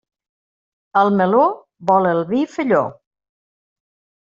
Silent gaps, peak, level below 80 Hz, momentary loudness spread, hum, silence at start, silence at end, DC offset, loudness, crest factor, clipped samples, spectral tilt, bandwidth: none; -2 dBFS; -64 dBFS; 7 LU; none; 0.95 s; 1.35 s; under 0.1%; -17 LUFS; 16 dB; under 0.1%; -6 dB/octave; 7.6 kHz